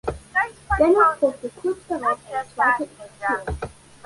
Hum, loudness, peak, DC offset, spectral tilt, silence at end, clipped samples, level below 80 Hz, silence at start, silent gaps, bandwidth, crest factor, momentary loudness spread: none; -22 LUFS; -4 dBFS; under 0.1%; -6 dB/octave; 0.4 s; under 0.1%; -40 dBFS; 0.05 s; none; 11.5 kHz; 18 dB; 14 LU